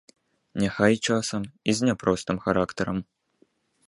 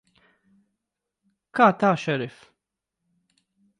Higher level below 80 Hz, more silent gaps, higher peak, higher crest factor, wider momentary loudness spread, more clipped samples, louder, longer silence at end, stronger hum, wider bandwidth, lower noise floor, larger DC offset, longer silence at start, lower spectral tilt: first, -54 dBFS vs -74 dBFS; neither; about the same, -4 dBFS vs -4 dBFS; about the same, 22 dB vs 24 dB; second, 8 LU vs 14 LU; neither; second, -25 LUFS vs -22 LUFS; second, 0.85 s vs 1.5 s; neither; about the same, 11.5 kHz vs 11 kHz; second, -66 dBFS vs -84 dBFS; neither; second, 0.55 s vs 1.55 s; second, -5 dB/octave vs -6.5 dB/octave